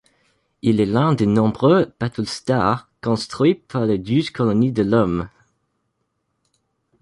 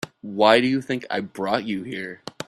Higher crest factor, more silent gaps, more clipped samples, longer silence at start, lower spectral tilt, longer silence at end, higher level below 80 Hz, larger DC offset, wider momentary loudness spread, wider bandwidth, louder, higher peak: second, 16 dB vs 22 dB; neither; neither; first, 0.65 s vs 0.05 s; first, -7.5 dB/octave vs -5 dB/octave; first, 1.75 s vs 0.05 s; first, -48 dBFS vs -62 dBFS; neither; second, 8 LU vs 15 LU; second, 11.5 kHz vs 13 kHz; first, -19 LUFS vs -22 LUFS; second, -4 dBFS vs 0 dBFS